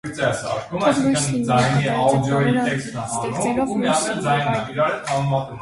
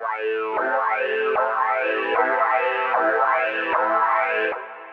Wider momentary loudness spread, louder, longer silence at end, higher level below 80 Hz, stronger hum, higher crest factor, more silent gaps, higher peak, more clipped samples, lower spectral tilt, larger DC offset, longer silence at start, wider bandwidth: about the same, 6 LU vs 5 LU; about the same, -20 LUFS vs -21 LUFS; about the same, 0 s vs 0 s; first, -50 dBFS vs -72 dBFS; neither; about the same, 16 dB vs 16 dB; neither; about the same, -4 dBFS vs -6 dBFS; neither; about the same, -5 dB/octave vs -4.5 dB/octave; neither; about the same, 0.05 s vs 0 s; first, 11.5 kHz vs 6.2 kHz